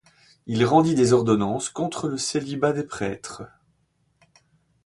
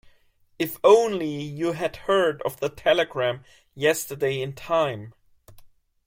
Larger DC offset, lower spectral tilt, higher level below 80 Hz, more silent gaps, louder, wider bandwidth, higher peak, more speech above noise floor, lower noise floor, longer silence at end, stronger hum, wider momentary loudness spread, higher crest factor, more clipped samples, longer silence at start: neither; about the same, -5.5 dB/octave vs -4.5 dB/octave; about the same, -58 dBFS vs -58 dBFS; neither; about the same, -23 LUFS vs -24 LUFS; second, 11.5 kHz vs 16.5 kHz; about the same, -6 dBFS vs -4 dBFS; first, 46 dB vs 37 dB; first, -68 dBFS vs -60 dBFS; first, 1.4 s vs 0.4 s; neither; first, 18 LU vs 12 LU; about the same, 20 dB vs 20 dB; neither; second, 0.45 s vs 0.6 s